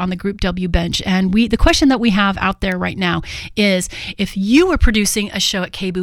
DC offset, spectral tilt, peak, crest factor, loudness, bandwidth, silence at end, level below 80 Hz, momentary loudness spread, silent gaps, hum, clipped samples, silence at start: under 0.1%; -4.5 dB/octave; 0 dBFS; 16 dB; -16 LUFS; 16 kHz; 0 s; -24 dBFS; 9 LU; none; none; under 0.1%; 0 s